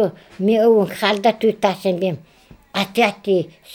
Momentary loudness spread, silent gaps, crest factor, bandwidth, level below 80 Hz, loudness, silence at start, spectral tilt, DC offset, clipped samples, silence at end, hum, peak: 9 LU; none; 18 dB; 18.5 kHz; -60 dBFS; -18 LUFS; 0 s; -5.5 dB/octave; under 0.1%; under 0.1%; 0 s; none; -2 dBFS